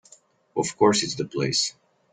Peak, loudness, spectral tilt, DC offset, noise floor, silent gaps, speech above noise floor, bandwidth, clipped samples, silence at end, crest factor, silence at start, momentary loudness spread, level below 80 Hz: -6 dBFS; -24 LUFS; -3.5 dB/octave; under 0.1%; -56 dBFS; none; 33 dB; 9.6 kHz; under 0.1%; 0.4 s; 20 dB; 0.55 s; 8 LU; -64 dBFS